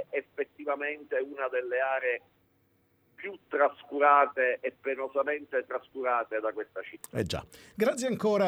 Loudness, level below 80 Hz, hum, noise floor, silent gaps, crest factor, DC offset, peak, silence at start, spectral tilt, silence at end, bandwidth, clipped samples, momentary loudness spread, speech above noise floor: -30 LUFS; -64 dBFS; none; -69 dBFS; none; 22 dB; under 0.1%; -8 dBFS; 0 s; -5 dB/octave; 0 s; 15.5 kHz; under 0.1%; 13 LU; 40 dB